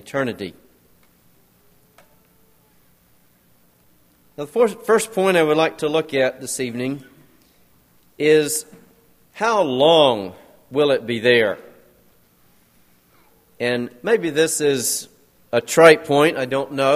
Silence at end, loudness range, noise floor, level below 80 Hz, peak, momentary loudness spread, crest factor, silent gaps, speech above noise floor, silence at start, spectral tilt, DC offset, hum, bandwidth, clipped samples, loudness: 0 s; 7 LU; -57 dBFS; -66 dBFS; 0 dBFS; 13 LU; 20 dB; none; 39 dB; 0.05 s; -3.5 dB/octave; under 0.1%; none; 15.5 kHz; under 0.1%; -18 LUFS